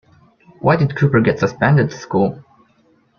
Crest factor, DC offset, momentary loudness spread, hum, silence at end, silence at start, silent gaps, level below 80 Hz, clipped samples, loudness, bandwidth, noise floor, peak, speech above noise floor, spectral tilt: 16 dB; under 0.1%; 5 LU; none; 0.8 s; 0.65 s; none; -50 dBFS; under 0.1%; -16 LUFS; 6.8 kHz; -57 dBFS; -2 dBFS; 41 dB; -8 dB/octave